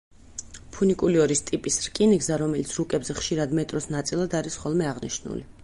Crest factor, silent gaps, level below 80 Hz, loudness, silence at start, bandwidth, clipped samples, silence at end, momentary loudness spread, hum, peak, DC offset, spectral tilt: 16 dB; none; -50 dBFS; -25 LUFS; 0.35 s; 11.5 kHz; under 0.1%; 0 s; 14 LU; none; -8 dBFS; under 0.1%; -4.5 dB/octave